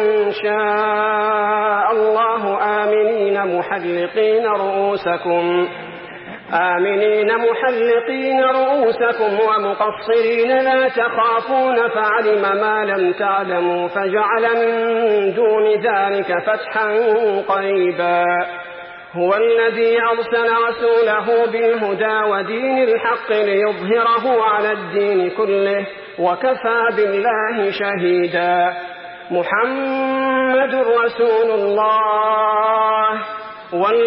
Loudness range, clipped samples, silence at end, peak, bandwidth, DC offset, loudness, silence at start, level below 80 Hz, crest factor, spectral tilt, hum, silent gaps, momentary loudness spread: 2 LU; under 0.1%; 0 s; -4 dBFS; 5.6 kHz; under 0.1%; -17 LUFS; 0 s; -64 dBFS; 12 dB; -10 dB/octave; none; none; 5 LU